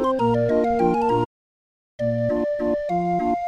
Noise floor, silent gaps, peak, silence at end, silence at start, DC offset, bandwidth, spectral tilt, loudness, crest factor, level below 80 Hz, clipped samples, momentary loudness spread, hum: under -90 dBFS; 1.25-1.99 s; -8 dBFS; 0 s; 0 s; under 0.1%; 10 kHz; -8.5 dB/octave; -22 LUFS; 14 dB; -48 dBFS; under 0.1%; 5 LU; none